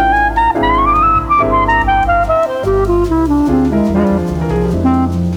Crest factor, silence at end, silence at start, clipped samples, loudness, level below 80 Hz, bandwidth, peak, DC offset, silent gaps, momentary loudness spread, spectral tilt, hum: 10 dB; 0 s; 0 s; under 0.1%; -12 LUFS; -22 dBFS; 16 kHz; -2 dBFS; under 0.1%; none; 4 LU; -7.5 dB/octave; none